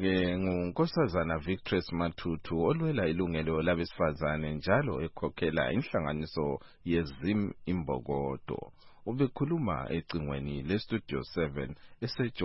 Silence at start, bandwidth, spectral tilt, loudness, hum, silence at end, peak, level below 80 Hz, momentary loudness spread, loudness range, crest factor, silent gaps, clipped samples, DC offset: 0 s; 5.8 kHz; -10.5 dB/octave; -32 LUFS; none; 0 s; -12 dBFS; -50 dBFS; 7 LU; 3 LU; 20 dB; none; under 0.1%; under 0.1%